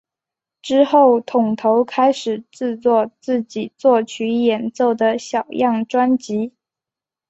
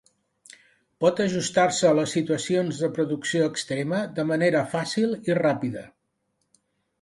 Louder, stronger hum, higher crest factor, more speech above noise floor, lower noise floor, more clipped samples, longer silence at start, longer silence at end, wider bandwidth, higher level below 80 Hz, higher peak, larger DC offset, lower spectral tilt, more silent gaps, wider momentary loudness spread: first, -18 LUFS vs -24 LUFS; neither; about the same, 16 dB vs 18 dB; first, 71 dB vs 51 dB; first, -88 dBFS vs -75 dBFS; neither; second, 0.65 s vs 1 s; second, 0.8 s vs 1.15 s; second, 8.2 kHz vs 11.5 kHz; about the same, -66 dBFS vs -66 dBFS; first, -2 dBFS vs -8 dBFS; neither; about the same, -5.5 dB/octave vs -5 dB/octave; neither; first, 10 LU vs 6 LU